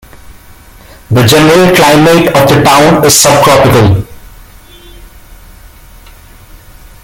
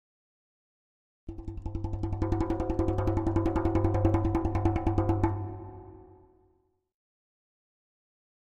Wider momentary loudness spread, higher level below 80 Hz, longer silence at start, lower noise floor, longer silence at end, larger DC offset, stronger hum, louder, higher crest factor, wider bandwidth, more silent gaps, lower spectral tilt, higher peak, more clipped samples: second, 6 LU vs 17 LU; first, -32 dBFS vs -38 dBFS; second, 0.3 s vs 1.25 s; second, -34 dBFS vs -71 dBFS; first, 2.9 s vs 2.45 s; neither; neither; first, -5 LUFS vs -29 LUFS; second, 8 dB vs 20 dB; first, over 20 kHz vs 7.4 kHz; neither; second, -4.5 dB/octave vs -9.5 dB/octave; first, 0 dBFS vs -10 dBFS; first, 0.5% vs under 0.1%